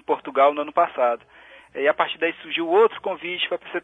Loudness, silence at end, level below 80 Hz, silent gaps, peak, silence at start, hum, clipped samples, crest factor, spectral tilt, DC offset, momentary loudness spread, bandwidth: -22 LUFS; 0.05 s; -70 dBFS; none; -4 dBFS; 0.1 s; none; under 0.1%; 18 dB; -5.5 dB/octave; under 0.1%; 9 LU; 4 kHz